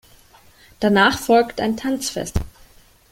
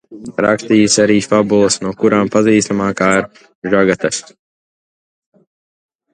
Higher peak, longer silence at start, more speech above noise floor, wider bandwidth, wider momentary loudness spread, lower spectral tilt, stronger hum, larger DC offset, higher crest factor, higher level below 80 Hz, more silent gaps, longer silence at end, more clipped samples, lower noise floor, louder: about the same, -2 dBFS vs 0 dBFS; first, 0.8 s vs 0.1 s; second, 32 dB vs over 77 dB; first, 17 kHz vs 10.5 kHz; first, 12 LU vs 8 LU; about the same, -4.5 dB/octave vs -4.5 dB/octave; neither; neither; about the same, 20 dB vs 16 dB; first, -38 dBFS vs -50 dBFS; second, none vs 3.55-3.62 s; second, 0.6 s vs 1.95 s; neither; second, -50 dBFS vs under -90 dBFS; second, -19 LUFS vs -13 LUFS